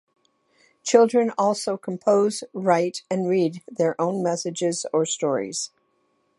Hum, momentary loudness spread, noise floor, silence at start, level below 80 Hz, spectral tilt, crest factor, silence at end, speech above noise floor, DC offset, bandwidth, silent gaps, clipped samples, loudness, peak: none; 8 LU; -68 dBFS; 0.85 s; -76 dBFS; -4.5 dB/octave; 20 dB; 0.7 s; 46 dB; under 0.1%; 11.5 kHz; none; under 0.1%; -23 LUFS; -2 dBFS